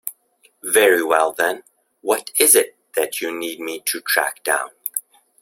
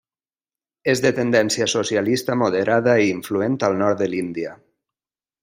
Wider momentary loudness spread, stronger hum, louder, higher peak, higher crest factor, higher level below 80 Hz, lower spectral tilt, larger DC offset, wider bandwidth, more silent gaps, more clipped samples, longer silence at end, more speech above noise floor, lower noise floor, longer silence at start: first, 14 LU vs 8 LU; neither; about the same, -18 LUFS vs -20 LUFS; first, 0 dBFS vs -4 dBFS; about the same, 20 dB vs 18 dB; about the same, -68 dBFS vs -64 dBFS; second, 0 dB/octave vs -4.5 dB/octave; neither; about the same, 16.5 kHz vs 16 kHz; neither; neither; second, 0.4 s vs 0.85 s; second, 40 dB vs over 71 dB; second, -59 dBFS vs under -90 dBFS; second, 0.05 s vs 0.85 s